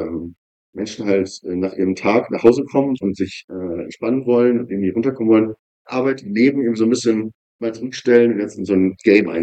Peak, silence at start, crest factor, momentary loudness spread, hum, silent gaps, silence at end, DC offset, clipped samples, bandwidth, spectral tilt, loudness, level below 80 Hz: 0 dBFS; 0 s; 18 dB; 13 LU; none; 0.38-0.73 s, 3.44-3.48 s, 5.59-5.85 s, 7.35-7.59 s; 0 s; under 0.1%; under 0.1%; 9 kHz; -6.5 dB/octave; -18 LUFS; -58 dBFS